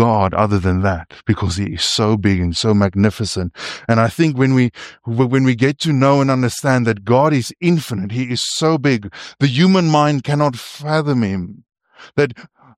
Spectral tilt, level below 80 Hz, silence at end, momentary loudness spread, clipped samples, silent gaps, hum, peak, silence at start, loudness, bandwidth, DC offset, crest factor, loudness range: -6 dB/octave; -44 dBFS; 0.3 s; 8 LU; under 0.1%; none; none; -2 dBFS; 0 s; -16 LUFS; 15 kHz; under 0.1%; 14 dB; 2 LU